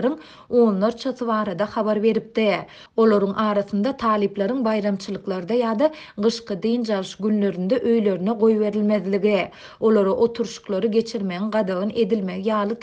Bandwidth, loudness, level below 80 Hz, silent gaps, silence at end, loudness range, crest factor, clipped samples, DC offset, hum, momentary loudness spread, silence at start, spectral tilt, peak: 8.4 kHz; -22 LUFS; -60 dBFS; none; 0 s; 2 LU; 14 dB; under 0.1%; under 0.1%; none; 7 LU; 0 s; -6.5 dB/octave; -6 dBFS